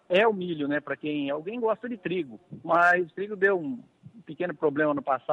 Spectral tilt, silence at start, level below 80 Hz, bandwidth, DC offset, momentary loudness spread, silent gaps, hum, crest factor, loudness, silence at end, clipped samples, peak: -7 dB/octave; 0.1 s; -74 dBFS; 9.6 kHz; under 0.1%; 13 LU; none; none; 16 dB; -27 LUFS; 0 s; under 0.1%; -10 dBFS